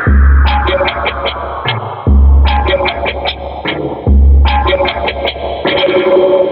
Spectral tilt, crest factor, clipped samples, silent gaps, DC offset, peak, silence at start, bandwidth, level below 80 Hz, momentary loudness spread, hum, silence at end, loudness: -9.5 dB/octave; 10 dB; under 0.1%; none; under 0.1%; 0 dBFS; 0 s; 5.4 kHz; -12 dBFS; 9 LU; none; 0 s; -12 LUFS